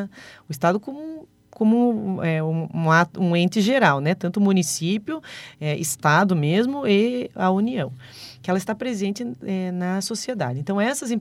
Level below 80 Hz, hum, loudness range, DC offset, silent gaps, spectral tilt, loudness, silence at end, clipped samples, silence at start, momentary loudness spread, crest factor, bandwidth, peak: -66 dBFS; none; 5 LU; under 0.1%; none; -5.5 dB/octave; -22 LUFS; 0 s; under 0.1%; 0 s; 14 LU; 20 dB; 16 kHz; -2 dBFS